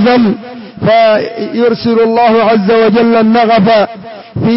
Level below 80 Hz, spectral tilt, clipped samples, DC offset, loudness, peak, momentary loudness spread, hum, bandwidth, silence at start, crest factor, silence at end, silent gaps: -48 dBFS; -10.5 dB/octave; under 0.1%; 0.4%; -9 LUFS; -2 dBFS; 9 LU; none; 5.8 kHz; 0 s; 8 dB; 0 s; none